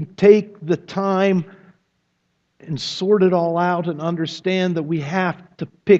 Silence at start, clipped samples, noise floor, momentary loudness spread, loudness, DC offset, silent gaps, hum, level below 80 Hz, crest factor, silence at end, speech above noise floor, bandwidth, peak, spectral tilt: 0 s; under 0.1%; -69 dBFS; 13 LU; -19 LUFS; under 0.1%; none; none; -64 dBFS; 18 dB; 0 s; 51 dB; 7.8 kHz; 0 dBFS; -7 dB/octave